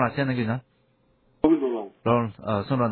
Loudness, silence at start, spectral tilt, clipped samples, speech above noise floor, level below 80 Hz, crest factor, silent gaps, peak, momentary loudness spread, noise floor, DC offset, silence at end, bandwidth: -25 LUFS; 0 s; -11.5 dB/octave; under 0.1%; 39 dB; -54 dBFS; 20 dB; none; -6 dBFS; 7 LU; -65 dBFS; under 0.1%; 0 s; 4.5 kHz